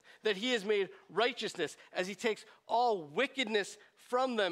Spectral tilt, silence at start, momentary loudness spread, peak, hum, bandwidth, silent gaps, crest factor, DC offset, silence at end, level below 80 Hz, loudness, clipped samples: -3 dB/octave; 0.1 s; 7 LU; -16 dBFS; none; 14 kHz; none; 18 dB; under 0.1%; 0 s; -88 dBFS; -34 LUFS; under 0.1%